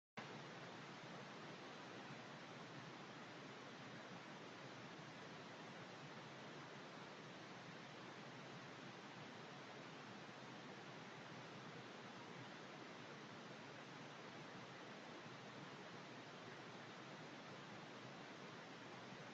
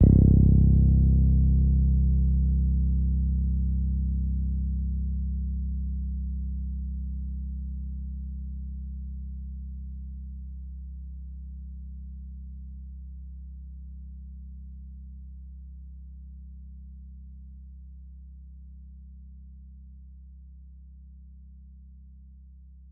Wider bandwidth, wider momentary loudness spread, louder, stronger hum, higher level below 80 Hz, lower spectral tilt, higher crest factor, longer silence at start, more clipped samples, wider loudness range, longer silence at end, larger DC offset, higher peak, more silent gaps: first, 8.2 kHz vs 0.8 kHz; second, 1 LU vs 26 LU; second, -56 LUFS vs -26 LUFS; neither; second, under -90 dBFS vs -28 dBFS; second, -4.5 dB/octave vs -17.5 dB/octave; about the same, 16 dB vs 20 dB; first, 0.15 s vs 0 s; neither; second, 0 LU vs 24 LU; about the same, 0 s vs 0.1 s; neither; second, -40 dBFS vs -6 dBFS; neither